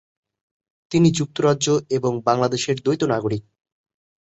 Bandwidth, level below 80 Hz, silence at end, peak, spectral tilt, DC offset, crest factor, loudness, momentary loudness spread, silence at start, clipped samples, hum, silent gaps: 8.2 kHz; -56 dBFS; 0.85 s; -4 dBFS; -5.5 dB/octave; under 0.1%; 18 dB; -21 LUFS; 6 LU; 0.9 s; under 0.1%; none; none